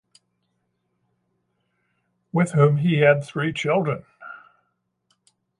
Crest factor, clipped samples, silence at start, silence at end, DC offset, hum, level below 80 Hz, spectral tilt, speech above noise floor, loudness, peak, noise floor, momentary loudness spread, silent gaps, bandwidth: 20 dB; under 0.1%; 2.35 s; 1.25 s; under 0.1%; none; -68 dBFS; -7 dB/octave; 54 dB; -21 LUFS; -4 dBFS; -73 dBFS; 22 LU; none; 11 kHz